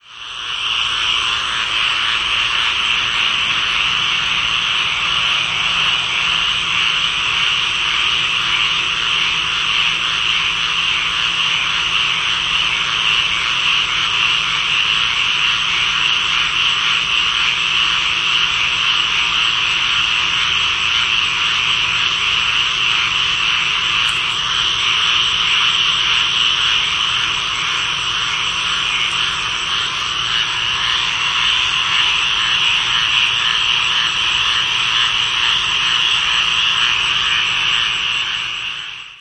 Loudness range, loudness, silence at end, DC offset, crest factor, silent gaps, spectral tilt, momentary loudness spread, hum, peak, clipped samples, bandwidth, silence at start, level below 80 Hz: 2 LU; -14 LUFS; 0 s; under 0.1%; 16 dB; none; 0.5 dB/octave; 3 LU; none; -2 dBFS; under 0.1%; 11 kHz; 0.1 s; -44 dBFS